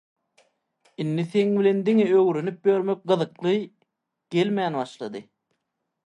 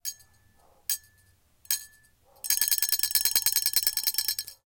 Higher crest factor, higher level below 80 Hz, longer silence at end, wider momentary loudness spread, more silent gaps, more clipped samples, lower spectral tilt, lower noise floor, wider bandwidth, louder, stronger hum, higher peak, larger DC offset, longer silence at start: second, 16 dB vs 26 dB; second, -74 dBFS vs -66 dBFS; first, 0.85 s vs 0.15 s; first, 13 LU vs 10 LU; neither; neither; first, -7.5 dB/octave vs 3.5 dB/octave; first, -79 dBFS vs -63 dBFS; second, 9.8 kHz vs 18 kHz; about the same, -23 LUFS vs -25 LUFS; neither; second, -8 dBFS vs -4 dBFS; neither; first, 1 s vs 0.05 s